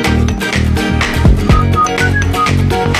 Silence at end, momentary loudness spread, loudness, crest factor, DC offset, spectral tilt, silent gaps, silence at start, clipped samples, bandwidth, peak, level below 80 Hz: 0 s; 3 LU; -12 LUFS; 10 dB; under 0.1%; -5.5 dB/octave; none; 0 s; under 0.1%; 15 kHz; 0 dBFS; -18 dBFS